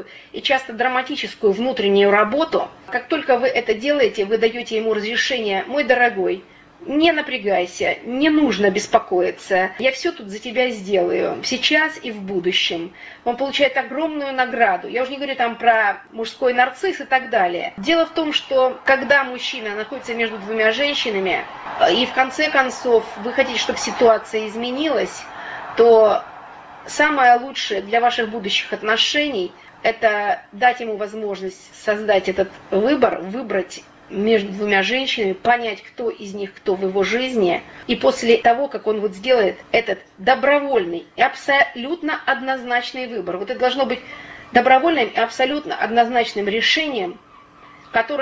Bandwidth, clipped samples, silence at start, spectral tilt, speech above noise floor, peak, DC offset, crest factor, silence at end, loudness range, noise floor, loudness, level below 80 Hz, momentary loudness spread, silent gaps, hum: 8 kHz; under 0.1%; 0 s; -3.5 dB/octave; 27 dB; 0 dBFS; under 0.1%; 18 dB; 0 s; 3 LU; -46 dBFS; -19 LUFS; -56 dBFS; 11 LU; none; none